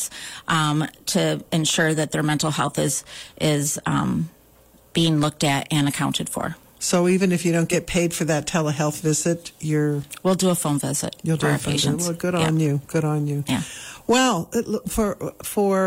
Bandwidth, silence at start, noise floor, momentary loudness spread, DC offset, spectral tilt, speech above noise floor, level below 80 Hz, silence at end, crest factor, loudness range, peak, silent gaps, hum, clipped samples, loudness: 16 kHz; 0 s; -53 dBFS; 8 LU; under 0.1%; -4.5 dB/octave; 31 dB; -48 dBFS; 0 s; 16 dB; 2 LU; -6 dBFS; none; none; under 0.1%; -22 LUFS